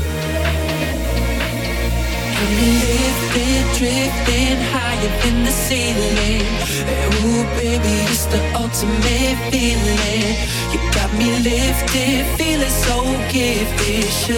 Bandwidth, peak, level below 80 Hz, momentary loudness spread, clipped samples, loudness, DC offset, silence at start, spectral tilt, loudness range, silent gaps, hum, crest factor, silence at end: 19 kHz; -2 dBFS; -22 dBFS; 4 LU; under 0.1%; -17 LUFS; under 0.1%; 0 s; -4 dB/octave; 1 LU; none; none; 14 dB; 0 s